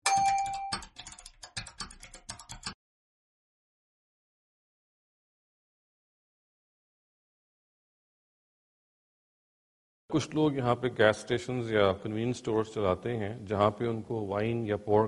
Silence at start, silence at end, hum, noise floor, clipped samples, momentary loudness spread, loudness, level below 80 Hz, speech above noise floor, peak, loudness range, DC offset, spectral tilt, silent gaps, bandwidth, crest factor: 0.05 s; 0 s; none; -50 dBFS; under 0.1%; 17 LU; -30 LUFS; -62 dBFS; 21 dB; -8 dBFS; 18 LU; under 0.1%; -5 dB/octave; 2.74-10.08 s; 11.5 kHz; 26 dB